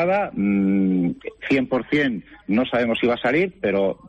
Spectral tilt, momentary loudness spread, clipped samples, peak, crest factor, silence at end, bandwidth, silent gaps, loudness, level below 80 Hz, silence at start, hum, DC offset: -8 dB/octave; 5 LU; under 0.1%; -10 dBFS; 12 dB; 0 s; 7.8 kHz; none; -21 LUFS; -54 dBFS; 0 s; none; under 0.1%